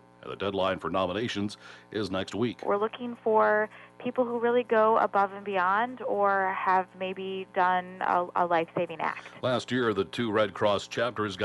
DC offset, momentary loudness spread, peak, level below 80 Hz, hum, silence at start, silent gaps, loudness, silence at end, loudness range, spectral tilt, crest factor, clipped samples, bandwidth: under 0.1%; 10 LU; -12 dBFS; -68 dBFS; 60 Hz at -55 dBFS; 0.25 s; none; -28 LUFS; 0 s; 3 LU; -5.5 dB/octave; 16 dB; under 0.1%; 11.5 kHz